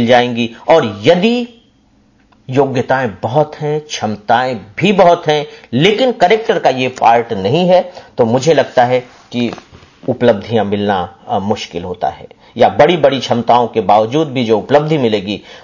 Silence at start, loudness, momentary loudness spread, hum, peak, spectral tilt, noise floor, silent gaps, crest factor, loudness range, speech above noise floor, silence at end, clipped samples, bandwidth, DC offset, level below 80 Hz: 0 s; -13 LUFS; 10 LU; none; 0 dBFS; -6 dB/octave; -51 dBFS; none; 14 dB; 5 LU; 39 dB; 0.05 s; under 0.1%; 7.4 kHz; under 0.1%; -48 dBFS